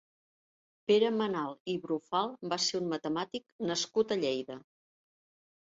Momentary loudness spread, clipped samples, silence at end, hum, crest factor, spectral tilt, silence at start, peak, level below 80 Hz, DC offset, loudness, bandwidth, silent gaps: 10 LU; under 0.1%; 1 s; none; 18 dB; -4 dB/octave; 0.9 s; -16 dBFS; -78 dBFS; under 0.1%; -32 LUFS; 7.8 kHz; 1.60-1.65 s, 3.52-3.59 s